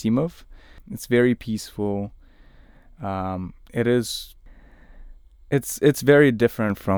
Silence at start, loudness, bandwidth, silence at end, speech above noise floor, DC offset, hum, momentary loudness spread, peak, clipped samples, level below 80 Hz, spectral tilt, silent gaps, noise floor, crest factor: 0 s; -22 LUFS; over 20 kHz; 0 s; 28 dB; under 0.1%; none; 18 LU; -2 dBFS; under 0.1%; -48 dBFS; -6 dB/octave; none; -49 dBFS; 20 dB